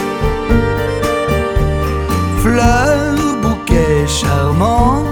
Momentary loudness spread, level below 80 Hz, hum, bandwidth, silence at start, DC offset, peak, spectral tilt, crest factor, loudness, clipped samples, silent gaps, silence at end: 5 LU; -20 dBFS; none; 19.5 kHz; 0 s; under 0.1%; 0 dBFS; -6 dB/octave; 12 dB; -14 LUFS; under 0.1%; none; 0 s